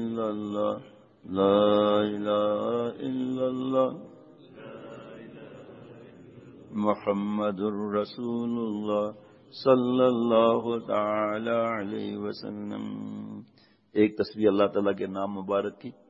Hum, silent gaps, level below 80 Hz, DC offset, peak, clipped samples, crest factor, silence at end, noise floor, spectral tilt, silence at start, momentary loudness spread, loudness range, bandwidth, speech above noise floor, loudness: none; none; -72 dBFS; under 0.1%; -8 dBFS; under 0.1%; 20 dB; 0.2 s; -50 dBFS; -8 dB/octave; 0 s; 21 LU; 7 LU; 7.4 kHz; 24 dB; -27 LUFS